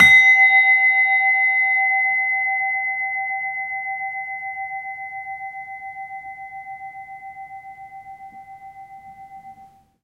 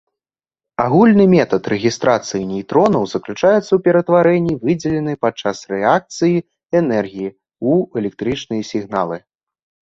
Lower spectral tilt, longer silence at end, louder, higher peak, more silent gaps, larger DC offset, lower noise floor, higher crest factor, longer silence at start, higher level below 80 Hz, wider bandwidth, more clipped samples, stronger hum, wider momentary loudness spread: second, -1 dB/octave vs -6.5 dB/octave; second, 0.4 s vs 0.7 s; about the same, -16 LUFS vs -16 LUFS; about the same, -2 dBFS vs -2 dBFS; neither; neither; second, -49 dBFS vs -90 dBFS; about the same, 18 dB vs 16 dB; second, 0 s vs 0.8 s; second, -58 dBFS vs -52 dBFS; first, 13.5 kHz vs 7.8 kHz; neither; neither; first, 25 LU vs 10 LU